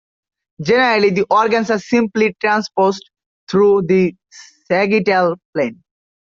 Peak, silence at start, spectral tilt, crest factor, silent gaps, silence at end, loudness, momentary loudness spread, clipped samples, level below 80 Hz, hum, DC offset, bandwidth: -2 dBFS; 0.6 s; -6 dB/octave; 14 dB; 3.26-3.47 s, 5.45-5.53 s; 0.5 s; -16 LUFS; 8 LU; under 0.1%; -58 dBFS; none; under 0.1%; 7.4 kHz